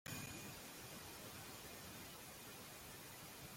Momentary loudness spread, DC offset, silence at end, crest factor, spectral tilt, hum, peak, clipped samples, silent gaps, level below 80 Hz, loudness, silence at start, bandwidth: 4 LU; under 0.1%; 0 s; 18 dB; -3 dB/octave; none; -36 dBFS; under 0.1%; none; -72 dBFS; -53 LUFS; 0.05 s; 16.5 kHz